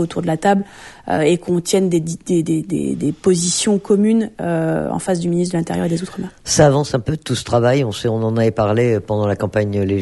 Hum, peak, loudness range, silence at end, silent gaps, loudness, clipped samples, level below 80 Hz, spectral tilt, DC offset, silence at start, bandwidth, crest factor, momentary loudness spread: none; 0 dBFS; 1 LU; 0 s; none; -17 LUFS; under 0.1%; -46 dBFS; -5.5 dB/octave; under 0.1%; 0 s; 12 kHz; 16 dB; 7 LU